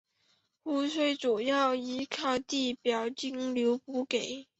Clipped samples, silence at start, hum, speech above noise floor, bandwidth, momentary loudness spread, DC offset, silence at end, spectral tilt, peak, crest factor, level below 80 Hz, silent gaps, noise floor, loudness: under 0.1%; 0.65 s; none; 42 dB; 8.2 kHz; 7 LU; under 0.1%; 0.15 s; -3 dB/octave; -14 dBFS; 16 dB; -74 dBFS; none; -73 dBFS; -31 LUFS